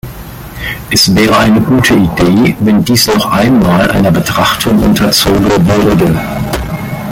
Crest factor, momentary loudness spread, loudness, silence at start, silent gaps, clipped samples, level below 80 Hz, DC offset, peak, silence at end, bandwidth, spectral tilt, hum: 8 dB; 11 LU; -9 LUFS; 0.05 s; none; under 0.1%; -28 dBFS; under 0.1%; 0 dBFS; 0 s; 17 kHz; -5 dB/octave; none